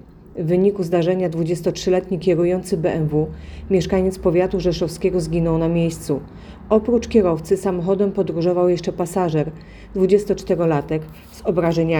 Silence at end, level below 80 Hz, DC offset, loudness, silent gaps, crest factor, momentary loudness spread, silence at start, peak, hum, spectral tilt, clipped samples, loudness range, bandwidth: 0 s; -40 dBFS; under 0.1%; -20 LUFS; none; 16 dB; 9 LU; 0.3 s; -2 dBFS; none; -7 dB/octave; under 0.1%; 1 LU; 19 kHz